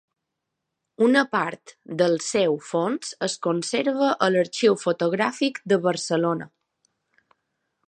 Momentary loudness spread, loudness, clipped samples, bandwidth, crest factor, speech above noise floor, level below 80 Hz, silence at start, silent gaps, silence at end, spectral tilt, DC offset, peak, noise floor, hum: 8 LU; -23 LUFS; under 0.1%; 11 kHz; 20 dB; 59 dB; -74 dBFS; 1 s; none; 1.4 s; -4.5 dB/octave; under 0.1%; -6 dBFS; -82 dBFS; none